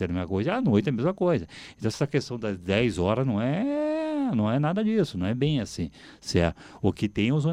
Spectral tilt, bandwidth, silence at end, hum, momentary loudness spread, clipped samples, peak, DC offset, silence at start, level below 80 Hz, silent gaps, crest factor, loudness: -7 dB/octave; 12 kHz; 0 s; none; 8 LU; under 0.1%; -8 dBFS; under 0.1%; 0 s; -50 dBFS; none; 18 dB; -26 LUFS